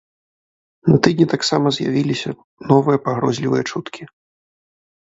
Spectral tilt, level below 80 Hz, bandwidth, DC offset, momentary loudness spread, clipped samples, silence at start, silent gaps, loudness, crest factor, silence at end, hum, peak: -6 dB/octave; -56 dBFS; 8 kHz; under 0.1%; 14 LU; under 0.1%; 0.85 s; 2.44-2.57 s; -18 LUFS; 18 dB; 1 s; none; 0 dBFS